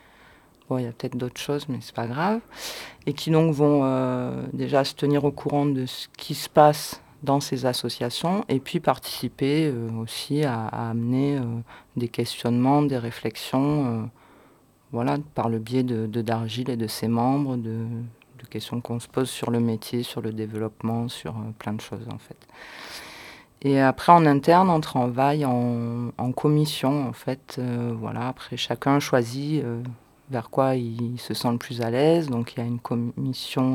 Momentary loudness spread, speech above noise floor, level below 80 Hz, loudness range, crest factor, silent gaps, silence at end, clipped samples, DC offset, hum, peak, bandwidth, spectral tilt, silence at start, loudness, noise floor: 13 LU; 32 dB; -60 dBFS; 8 LU; 22 dB; none; 0 s; under 0.1%; under 0.1%; none; -2 dBFS; 18 kHz; -6.5 dB/octave; 0.7 s; -25 LUFS; -57 dBFS